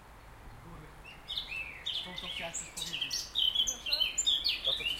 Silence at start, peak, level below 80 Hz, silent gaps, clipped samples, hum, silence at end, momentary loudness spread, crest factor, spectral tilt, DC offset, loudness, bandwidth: 0 s; -18 dBFS; -56 dBFS; none; under 0.1%; none; 0 s; 22 LU; 18 dB; 0.5 dB/octave; under 0.1%; -31 LUFS; 16 kHz